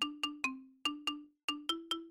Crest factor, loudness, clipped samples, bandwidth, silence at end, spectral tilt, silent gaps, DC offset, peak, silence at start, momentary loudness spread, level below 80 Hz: 14 dB; -38 LUFS; under 0.1%; 16.5 kHz; 0 s; 0 dB/octave; 1.44-1.48 s; under 0.1%; -26 dBFS; 0 s; 4 LU; -76 dBFS